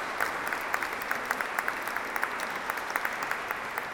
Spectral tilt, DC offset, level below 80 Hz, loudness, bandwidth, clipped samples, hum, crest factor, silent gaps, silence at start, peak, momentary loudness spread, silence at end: -1.5 dB/octave; under 0.1%; -64 dBFS; -31 LUFS; over 20 kHz; under 0.1%; none; 22 dB; none; 0 s; -10 dBFS; 2 LU; 0 s